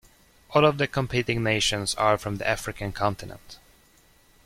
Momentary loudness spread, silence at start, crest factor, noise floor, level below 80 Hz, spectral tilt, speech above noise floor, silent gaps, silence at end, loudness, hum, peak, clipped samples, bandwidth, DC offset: 11 LU; 0.5 s; 20 dB; -58 dBFS; -48 dBFS; -4 dB/octave; 33 dB; none; 0.9 s; -25 LUFS; none; -6 dBFS; under 0.1%; 16.5 kHz; under 0.1%